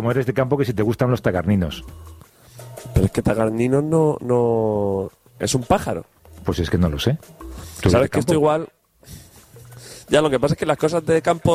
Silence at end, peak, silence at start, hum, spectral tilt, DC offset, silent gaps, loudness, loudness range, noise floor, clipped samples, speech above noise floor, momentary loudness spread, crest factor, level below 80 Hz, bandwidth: 0 s; -2 dBFS; 0 s; none; -6.5 dB/octave; under 0.1%; none; -20 LUFS; 2 LU; -45 dBFS; under 0.1%; 26 dB; 17 LU; 18 dB; -38 dBFS; 15.5 kHz